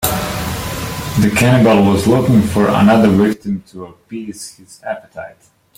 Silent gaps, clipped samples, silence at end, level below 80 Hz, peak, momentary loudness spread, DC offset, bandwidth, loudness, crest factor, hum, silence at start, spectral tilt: none; under 0.1%; 0.45 s; -38 dBFS; 0 dBFS; 22 LU; under 0.1%; 16.5 kHz; -13 LUFS; 14 dB; none; 0 s; -6 dB/octave